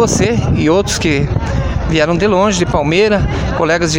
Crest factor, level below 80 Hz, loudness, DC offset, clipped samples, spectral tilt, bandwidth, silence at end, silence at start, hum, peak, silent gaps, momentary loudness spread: 12 dB; -24 dBFS; -13 LUFS; under 0.1%; under 0.1%; -5 dB/octave; 16.5 kHz; 0 s; 0 s; none; 0 dBFS; none; 5 LU